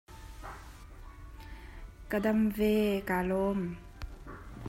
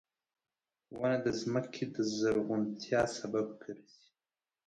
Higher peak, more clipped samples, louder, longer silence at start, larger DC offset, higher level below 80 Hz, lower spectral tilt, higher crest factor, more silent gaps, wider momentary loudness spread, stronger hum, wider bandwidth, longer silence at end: about the same, -16 dBFS vs -16 dBFS; neither; first, -30 LUFS vs -34 LUFS; second, 0.1 s vs 0.9 s; neither; first, -48 dBFS vs -68 dBFS; first, -7 dB/octave vs -5.5 dB/octave; about the same, 18 dB vs 20 dB; neither; first, 23 LU vs 15 LU; neither; first, 16 kHz vs 10.5 kHz; second, 0 s vs 0.85 s